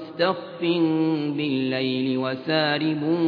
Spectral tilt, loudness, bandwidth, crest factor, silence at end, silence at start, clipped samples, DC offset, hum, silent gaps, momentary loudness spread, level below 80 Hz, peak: -8.5 dB/octave; -24 LUFS; 5 kHz; 16 dB; 0 s; 0 s; under 0.1%; under 0.1%; none; none; 4 LU; -74 dBFS; -8 dBFS